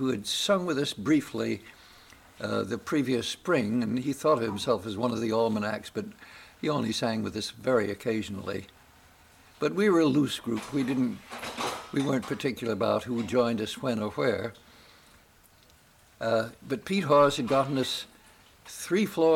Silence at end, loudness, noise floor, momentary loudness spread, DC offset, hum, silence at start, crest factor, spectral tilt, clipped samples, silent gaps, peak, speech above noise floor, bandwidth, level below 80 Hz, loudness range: 0 s; -28 LUFS; -59 dBFS; 12 LU; under 0.1%; none; 0 s; 18 dB; -5 dB/octave; under 0.1%; none; -10 dBFS; 31 dB; 17 kHz; -64 dBFS; 3 LU